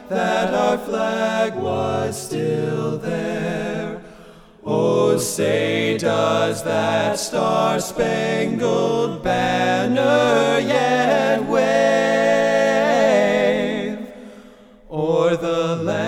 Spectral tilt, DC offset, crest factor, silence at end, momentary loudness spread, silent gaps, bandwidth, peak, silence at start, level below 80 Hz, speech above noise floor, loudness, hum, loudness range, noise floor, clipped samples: -5 dB/octave; under 0.1%; 14 dB; 0 s; 8 LU; none; 16.5 kHz; -4 dBFS; 0 s; -52 dBFS; 25 dB; -19 LUFS; none; 6 LU; -45 dBFS; under 0.1%